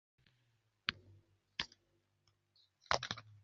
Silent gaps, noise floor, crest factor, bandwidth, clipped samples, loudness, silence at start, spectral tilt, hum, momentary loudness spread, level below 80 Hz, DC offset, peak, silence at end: none; -79 dBFS; 36 dB; 7.4 kHz; under 0.1%; -42 LUFS; 0.9 s; 0 dB/octave; none; 10 LU; -70 dBFS; under 0.1%; -12 dBFS; 0.05 s